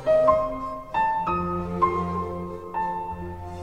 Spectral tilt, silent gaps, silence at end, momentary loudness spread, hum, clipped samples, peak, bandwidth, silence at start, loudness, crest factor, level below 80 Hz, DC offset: -8 dB/octave; none; 0 s; 13 LU; none; under 0.1%; -6 dBFS; 9.4 kHz; 0 s; -26 LUFS; 18 dB; -46 dBFS; 0.3%